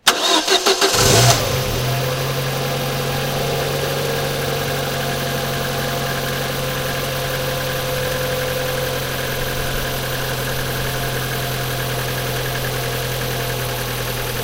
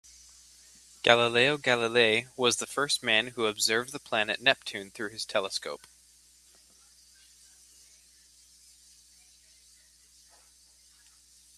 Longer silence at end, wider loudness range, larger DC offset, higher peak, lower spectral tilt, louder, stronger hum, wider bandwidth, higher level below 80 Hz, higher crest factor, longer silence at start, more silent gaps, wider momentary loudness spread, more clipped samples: second, 0 s vs 5.8 s; second, 5 LU vs 13 LU; neither; about the same, 0 dBFS vs -2 dBFS; first, -3.5 dB/octave vs -2 dB/octave; first, -19 LUFS vs -26 LUFS; neither; first, 16 kHz vs 14 kHz; first, -36 dBFS vs -70 dBFS; second, 20 dB vs 30 dB; second, 0.05 s vs 1.05 s; neither; second, 8 LU vs 13 LU; neither